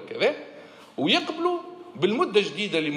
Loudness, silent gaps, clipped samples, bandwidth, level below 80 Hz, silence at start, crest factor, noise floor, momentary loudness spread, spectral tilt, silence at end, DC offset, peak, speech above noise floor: -25 LUFS; none; under 0.1%; 11 kHz; -80 dBFS; 0 s; 18 dB; -46 dBFS; 17 LU; -4.5 dB/octave; 0 s; under 0.1%; -8 dBFS; 22 dB